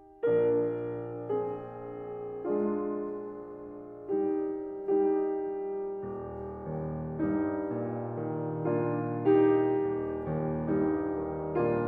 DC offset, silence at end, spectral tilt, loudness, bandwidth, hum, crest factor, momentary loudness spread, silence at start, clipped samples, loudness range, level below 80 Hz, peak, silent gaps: under 0.1%; 0 s; -11.5 dB/octave; -31 LUFS; 3.5 kHz; none; 16 dB; 13 LU; 0 s; under 0.1%; 6 LU; -60 dBFS; -14 dBFS; none